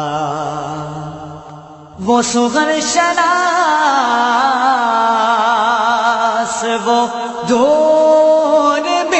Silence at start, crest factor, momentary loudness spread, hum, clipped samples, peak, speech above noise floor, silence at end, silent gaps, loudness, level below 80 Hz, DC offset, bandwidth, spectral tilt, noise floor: 0 s; 12 dB; 13 LU; none; under 0.1%; 0 dBFS; 22 dB; 0 s; none; -13 LUFS; -54 dBFS; under 0.1%; 8.4 kHz; -3 dB/octave; -35 dBFS